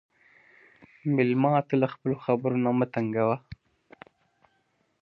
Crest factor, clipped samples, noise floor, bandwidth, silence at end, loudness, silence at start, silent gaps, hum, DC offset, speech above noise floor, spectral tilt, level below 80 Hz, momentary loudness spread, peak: 20 dB; under 0.1%; -71 dBFS; 5.6 kHz; 1.5 s; -26 LUFS; 1.05 s; none; none; under 0.1%; 46 dB; -10.5 dB/octave; -66 dBFS; 6 LU; -8 dBFS